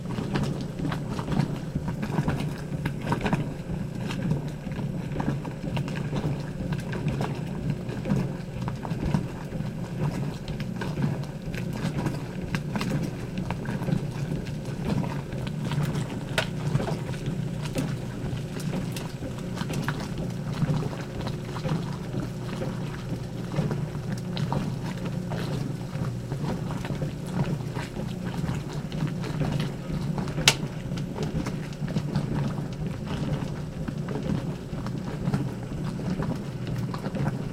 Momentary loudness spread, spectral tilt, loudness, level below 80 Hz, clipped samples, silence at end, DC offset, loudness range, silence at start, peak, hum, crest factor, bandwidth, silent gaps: 5 LU; -6 dB/octave; -30 LUFS; -44 dBFS; under 0.1%; 0 s; under 0.1%; 3 LU; 0 s; -2 dBFS; none; 28 dB; 16 kHz; none